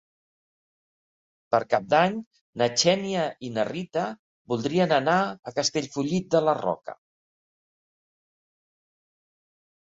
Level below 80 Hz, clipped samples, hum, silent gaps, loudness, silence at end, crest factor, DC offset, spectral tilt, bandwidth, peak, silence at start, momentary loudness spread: -68 dBFS; under 0.1%; none; 2.26-2.31 s, 2.41-2.53 s, 4.19-4.45 s, 5.39-5.43 s; -25 LUFS; 2.95 s; 20 dB; under 0.1%; -4 dB/octave; 8 kHz; -6 dBFS; 1.5 s; 11 LU